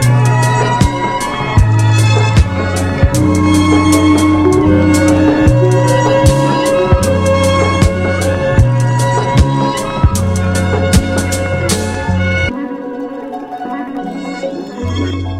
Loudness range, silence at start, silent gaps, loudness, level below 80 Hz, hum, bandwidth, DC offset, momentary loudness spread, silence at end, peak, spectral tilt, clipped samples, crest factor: 7 LU; 0 s; none; -12 LUFS; -24 dBFS; none; 15.5 kHz; under 0.1%; 12 LU; 0 s; 0 dBFS; -6 dB/octave; under 0.1%; 12 dB